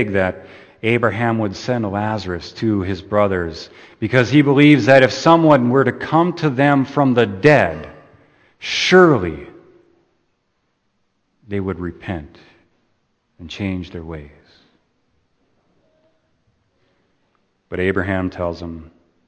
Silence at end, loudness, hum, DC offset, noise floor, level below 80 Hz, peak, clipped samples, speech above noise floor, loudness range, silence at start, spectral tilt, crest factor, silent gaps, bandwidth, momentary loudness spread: 0.45 s; -16 LUFS; none; under 0.1%; -68 dBFS; -48 dBFS; 0 dBFS; under 0.1%; 52 dB; 19 LU; 0 s; -6.5 dB/octave; 18 dB; none; 8.8 kHz; 20 LU